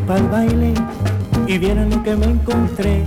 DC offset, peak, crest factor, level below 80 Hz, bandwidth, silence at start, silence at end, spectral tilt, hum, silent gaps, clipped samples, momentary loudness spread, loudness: under 0.1%; -8 dBFS; 8 dB; -22 dBFS; 16 kHz; 0 s; 0 s; -7.5 dB/octave; none; none; under 0.1%; 3 LU; -17 LUFS